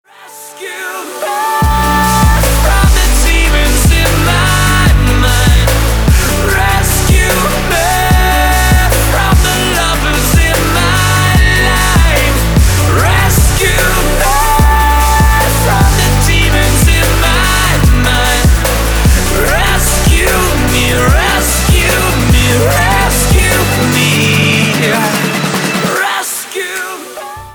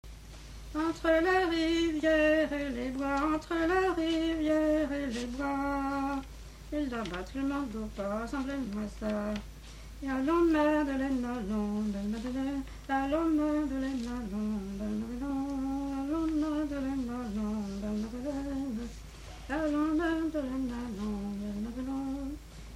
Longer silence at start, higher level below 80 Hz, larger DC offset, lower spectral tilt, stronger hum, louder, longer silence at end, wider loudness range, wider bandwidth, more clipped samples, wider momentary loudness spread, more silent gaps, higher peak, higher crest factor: first, 0.2 s vs 0.05 s; first, -14 dBFS vs -46 dBFS; neither; second, -4 dB/octave vs -6 dB/octave; neither; first, -10 LUFS vs -32 LUFS; about the same, 0 s vs 0 s; second, 1 LU vs 6 LU; first, over 20 kHz vs 14 kHz; neither; second, 4 LU vs 11 LU; neither; first, 0 dBFS vs -14 dBFS; second, 10 dB vs 16 dB